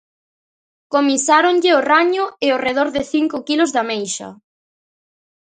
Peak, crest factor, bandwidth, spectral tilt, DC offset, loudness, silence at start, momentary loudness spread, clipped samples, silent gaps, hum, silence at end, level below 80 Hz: 0 dBFS; 18 dB; 9.6 kHz; -2 dB/octave; under 0.1%; -16 LUFS; 0.9 s; 9 LU; under 0.1%; none; none; 1.15 s; -60 dBFS